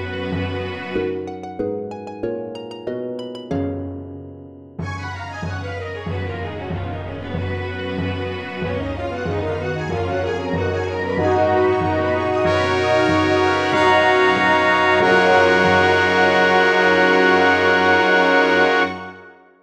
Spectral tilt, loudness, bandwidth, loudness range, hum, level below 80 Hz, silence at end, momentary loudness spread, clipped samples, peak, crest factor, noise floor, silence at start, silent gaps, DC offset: -5.5 dB/octave; -18 LUFS; 10.5 kHz; 14 LU; none; -46 dBFS; 0.3 s; 15 LU; under 0.1%; 0 dBFS; 18 dB; -43 dBFS; 0 s; none; under 0.1%